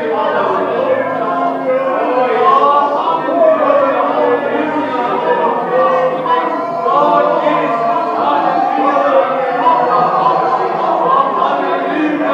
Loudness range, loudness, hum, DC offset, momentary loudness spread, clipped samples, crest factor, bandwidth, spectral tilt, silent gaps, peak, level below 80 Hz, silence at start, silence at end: 1 LU; -13 LUFS; none; under 0.1%; 5 LU; under 0.1%; 12 dB; 7.6 kHz; -6.5 dB/octave; none; 0 dBFS; -70 dBFS; 0 s; 0 s